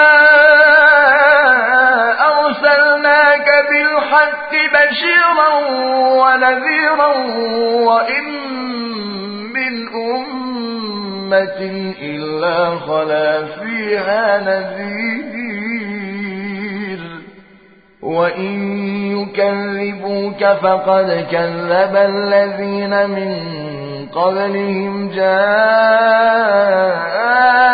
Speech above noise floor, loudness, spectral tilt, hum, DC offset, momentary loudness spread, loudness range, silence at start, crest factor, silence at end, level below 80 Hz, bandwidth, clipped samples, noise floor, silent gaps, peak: 32 dB; -13 LUFS; -9 dB/octave; none; under 0.1%; 14 LU; 10 LU; 0 s; 14 dB; 0 s; -60 dBFS; 5 kHz; under 0.1%; -46 dBFS; none; 0 dBFS